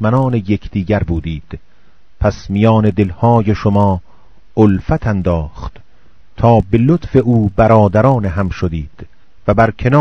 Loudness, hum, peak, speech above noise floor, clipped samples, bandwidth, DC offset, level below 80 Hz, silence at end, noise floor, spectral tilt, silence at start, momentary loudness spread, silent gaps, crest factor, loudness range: -14 LUFS; none; 0 dBFS; 39 dB; 0.3%; 6.6 kHz; 2%; -30 dBFS; 0 s; -52 dBFS; -9 dB/octave; 0 s; 13 LU; none; 14 dB; 3 LU